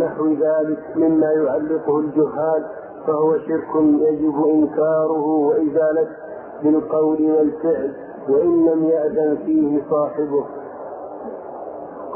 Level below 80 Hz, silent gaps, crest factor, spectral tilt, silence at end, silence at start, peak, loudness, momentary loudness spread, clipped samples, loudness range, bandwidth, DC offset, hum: -58 dBFS; none; 12 dB; -13.5 dB/octave; 0 s; 0 s; -6 dBFS; -19 LUFS; 16 LU; under 0.1%; 1 LU; 2.6 kHz; under 0.1%; none